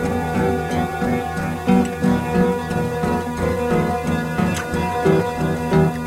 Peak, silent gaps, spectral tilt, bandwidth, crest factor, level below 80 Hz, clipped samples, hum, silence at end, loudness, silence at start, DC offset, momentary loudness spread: -4 dBFS; none; -7 dB/octave; 16.5 kHz; 16 dB; -40 dBFS; under 0.1%; none; 0 s; -20 LUFS; 0 s; under 0.1%; 4 LU